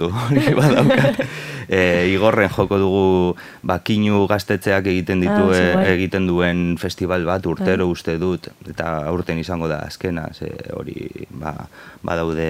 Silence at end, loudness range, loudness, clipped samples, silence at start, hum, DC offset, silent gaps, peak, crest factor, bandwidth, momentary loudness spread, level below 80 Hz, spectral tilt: 0 s; 9 LU; -18 LUFS; under 0.1%; 0 s; none; under 0.1%; none; 0 dBFS; 18 dB; 15.5 kHz; 15 LU; -44 dBFS; -6.5 dB/octave